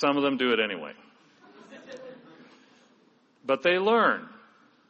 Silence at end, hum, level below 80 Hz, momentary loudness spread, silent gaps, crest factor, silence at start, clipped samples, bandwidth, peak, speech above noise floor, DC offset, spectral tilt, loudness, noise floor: 0.6 s; none; -76 dBFS; 24 LU; none; 20 dB; 0 s; under 0.1%; 7.2 kHz; -10 dBFS; 38 dB; under 0.1%; -5 dB/octave; -25 LUFS; -63 dBFS